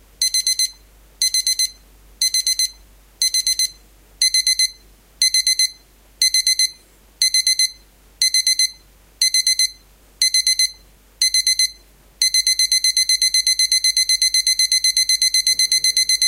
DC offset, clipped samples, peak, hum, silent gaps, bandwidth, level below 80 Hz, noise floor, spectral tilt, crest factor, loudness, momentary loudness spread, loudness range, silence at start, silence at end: under 0.1%; under 0.1%; -2 dBFS; none; none; 17 kHz; -52 dBFS; -48 dBFS; 5 dB/octave; 18 dB; -15 LUFS; 6 LU; 4 LU; 0.2 s; 0 s